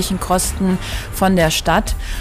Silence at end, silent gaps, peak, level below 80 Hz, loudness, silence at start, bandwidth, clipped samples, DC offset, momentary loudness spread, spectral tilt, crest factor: 0 s; none; -4 dBFS; -26 dBFS; -17 LUFS; 0 s; 16 kHz; under 0.1%; under 0.1%; 8 LU; -4.5 dB/octave; 12 dB